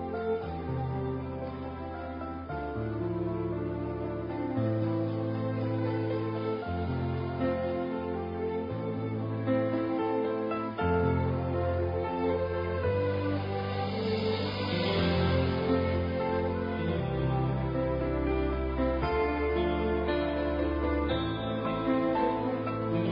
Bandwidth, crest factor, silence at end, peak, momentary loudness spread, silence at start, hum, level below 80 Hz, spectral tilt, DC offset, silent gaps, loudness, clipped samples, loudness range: 5.4 kHz; 14 dB; 0 s; -16 dBFS; 6 LU; 0 s; none; -44 dBFS; -10 dB/octave; under 0.1%; none; -31 LUFS; under 0.1%; 4 LU